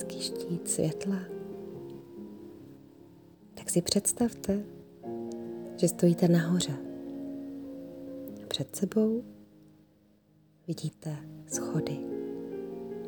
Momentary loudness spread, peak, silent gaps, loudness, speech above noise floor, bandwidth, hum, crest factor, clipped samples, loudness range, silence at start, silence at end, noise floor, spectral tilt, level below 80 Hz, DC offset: 19 LU; -12 dBFS; none; -32 LUFS; 34 dB; over 20 kHz; none; 22 dB; under 0.1%; 8 LU; 0 s; 0 s; -63 dBFS; -5 dB/octave; -66 dBFS; under 0.1%